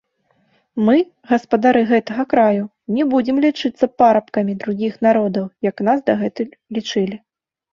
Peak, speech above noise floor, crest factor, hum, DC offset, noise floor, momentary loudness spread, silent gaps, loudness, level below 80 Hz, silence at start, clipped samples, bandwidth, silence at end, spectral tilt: -2 dBFS; 46 dB; 16 dB; none; under 0.1%; -63 dBFS; 9 LU; none; -18 LUFS; -60 dBFS; 0.75 s; under 0.1%; 7.2 kHz; 0.55 s; -6.5 dB/octave